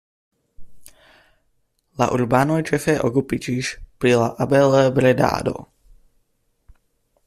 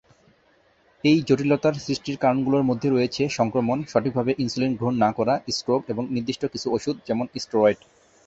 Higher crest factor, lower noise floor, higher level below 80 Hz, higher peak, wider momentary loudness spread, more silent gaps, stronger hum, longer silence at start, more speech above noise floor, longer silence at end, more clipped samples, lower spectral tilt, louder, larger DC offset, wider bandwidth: about the same, 18 dB vs 18 dB; first, -67 dBFS vs -61 dBFS; first, -48 dBFS vs -58 dBFS; about the same, -4 dBFS vs -6 dBFS; first, 10 LU vs 7 LU; neither; neither; second, 0.6 s vs 1.05 s; first, 49 dB vs 38 dB; first, 1.6 s vs 0.5 s; neither; about the same, -6 dB/octave vs -6 dB/octave; first, -19 LUFS vs -23 LUFS; neither; first, 14.5 kHz vs 8 kHz